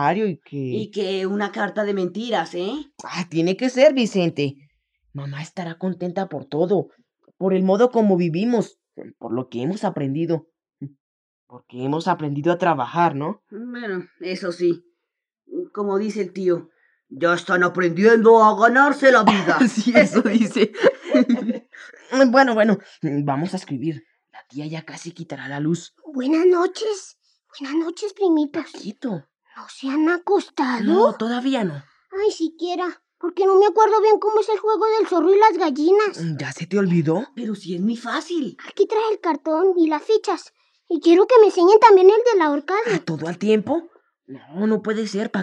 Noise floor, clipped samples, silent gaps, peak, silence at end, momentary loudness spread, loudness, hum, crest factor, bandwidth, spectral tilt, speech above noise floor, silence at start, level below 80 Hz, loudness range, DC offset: -82 dBFS; under 0.1%; 11.00-11.47 s; 0 dBFS; 0 s; 17 LU; -19 LUFS; none; 18 dB; 9.8 kHz; -6 dB/octave; 63 dB; 0 s; -76 dBFS; 11 LU; under 0.1%